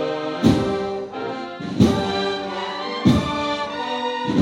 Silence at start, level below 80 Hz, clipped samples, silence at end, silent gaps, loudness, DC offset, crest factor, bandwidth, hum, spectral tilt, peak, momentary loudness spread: 0 s; -42 dBFS; under 0.1%; 0 s; none; -22 LUFS; under 0.1%; 20 dB; 16 kHz; none; -6.5 dB/octave; -2 dBFS; 10 LU